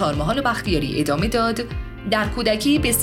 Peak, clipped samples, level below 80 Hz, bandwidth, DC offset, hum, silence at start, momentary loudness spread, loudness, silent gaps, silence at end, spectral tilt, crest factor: -4 dBFS; under 0.1%; -34 dBFS; 17.5 kHz; under 0.1%; none; 0 s; 6 LU; -21 LUFS; none; 0 s; -4.5 dB/octave; 16 dB